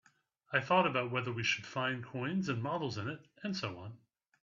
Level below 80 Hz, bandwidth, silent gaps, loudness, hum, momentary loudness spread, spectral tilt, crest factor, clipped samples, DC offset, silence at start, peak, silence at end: -76 dBFS; 7.4 kHz; none; -35 LUFS; none; 13 LU; -5 dB/octave; 22 dB; under 0.1%; under 0.1%; 0.5 s; -14 dBFS; 0.45 s